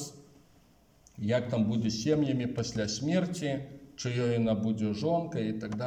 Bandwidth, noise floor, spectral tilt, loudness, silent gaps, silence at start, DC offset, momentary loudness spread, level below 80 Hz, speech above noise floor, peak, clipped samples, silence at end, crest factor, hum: 14.5 kHz; -62 dBFS; -6 dB/octave; -31 LUFS; none; 0 s; under 0.1%; 8 LU; -62 dBFS; 32 dB; -16 dBFS; under 0.1%; 0 s; 16 dB; none